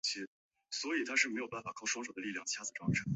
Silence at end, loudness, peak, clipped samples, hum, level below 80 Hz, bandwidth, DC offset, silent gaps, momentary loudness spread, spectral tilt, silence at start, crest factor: 0 s; -37 LUFS; -16 dBFS; under 0.1%; none; -66 dBFS; 8.2 kHz; under 0.1%; 0.27-0.51 s; 11 LU; -3 dB/octave; 0.05 s; 22 dB